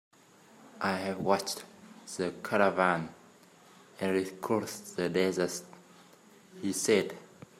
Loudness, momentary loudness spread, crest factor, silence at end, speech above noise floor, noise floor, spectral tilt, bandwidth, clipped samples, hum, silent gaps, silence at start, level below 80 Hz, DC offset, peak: -31 LUFS; 13 LU; 24 dB; 0.35 s; 28 dB; -59 dBFS; -4 dB/octave; 16 kHz; under 0.1%; none; none; 0.6 s; -76 dBFS; under 0.1%; -10 dBFS